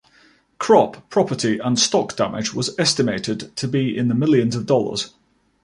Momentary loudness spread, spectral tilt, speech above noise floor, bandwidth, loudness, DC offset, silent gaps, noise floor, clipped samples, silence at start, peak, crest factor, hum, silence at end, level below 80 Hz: 9 LU; -4.5 dB/octave; 36 dB; 11.5 kHz; -20 LUFS; under 0.1%; none; -55 dBFS; under 0.1%; 0.6 s; -2 dBFS; 18 dB; none; 0.55 s; -58 dBFS